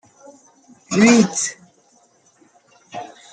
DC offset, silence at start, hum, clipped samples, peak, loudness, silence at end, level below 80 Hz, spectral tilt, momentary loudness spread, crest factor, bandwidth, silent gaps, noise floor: under 0.1%; 0.9 s; none; under 0.1%; -2 dBFS; -16 LUFS; 0.25 s; -64 dBFS; -4 dB/octave; 22 LU; 20 dB; 9.4 kHz; none; -57 dBFS